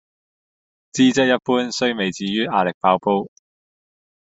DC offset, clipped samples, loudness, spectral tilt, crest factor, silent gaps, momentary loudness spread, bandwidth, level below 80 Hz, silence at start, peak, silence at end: under 0.1%; under 0.1%; -19 LUFS; -4.5 dB/octave; 20 dB; 2.74-2.81 s; 7 LU; 8 kHz; -62 dBFS; 0.95 s; -2 dBFS; 1.1 s